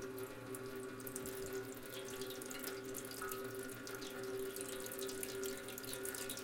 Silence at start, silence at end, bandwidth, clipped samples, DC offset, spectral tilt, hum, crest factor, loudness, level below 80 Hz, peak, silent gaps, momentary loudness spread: 0 s; 0 s; 17 kHz; under 0.1%; under 0.1%; -3 dB/octave; none; 24 dB; -45 LUFS; -68 dBFS; -22 dBFS; none; 4 LU